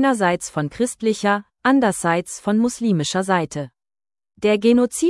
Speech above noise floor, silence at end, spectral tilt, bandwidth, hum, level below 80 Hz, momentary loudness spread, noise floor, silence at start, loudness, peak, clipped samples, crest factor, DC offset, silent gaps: over 71 dB; 0 s; -5 dB/octave; 12 kHz; none; -56 dBFS; 7 LU; under -90 dBFS; 0 s; -20 LUFS; -4 dBFS; under 0.1%; 16 dB; under 0.1%; none